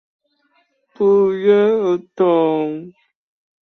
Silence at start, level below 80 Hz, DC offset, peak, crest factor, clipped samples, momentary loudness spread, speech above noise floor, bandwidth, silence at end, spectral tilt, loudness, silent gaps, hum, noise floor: 1 s; -64 dBFS; under 0.1%; -4 dBFS; 14 dB; under 0.1%; 8 LU; 47 dB; 6.2 kHz; 0.75 s; -8 dB/octave; -16 LUFS; none; none; -62 dBFS